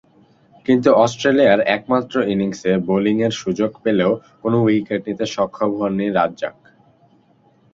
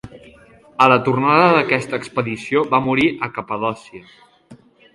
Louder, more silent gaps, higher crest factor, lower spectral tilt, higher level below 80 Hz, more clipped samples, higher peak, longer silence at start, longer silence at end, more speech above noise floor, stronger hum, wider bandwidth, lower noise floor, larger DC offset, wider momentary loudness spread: about the same, -18 LUFS vs -17 LUFS; neither; about the same, 18 dB vs 18 dB; about the same, -6 dB/octave vs -6.5 dB/octave; about the same, -56 dBFS vs -54 dBFS; neither; about the same, -2 dBFS vs 0 dBFS; first, 0.7 s vs 0.05 s; first, 1.25 s vs 0.4 s; first, 38 dB vs 30 dB; neither; second, 7.8 kHz vs 11.5 kHz; first, -55 dBFS vs -47 dBFS; neither; second, 8 LU vs 11 LU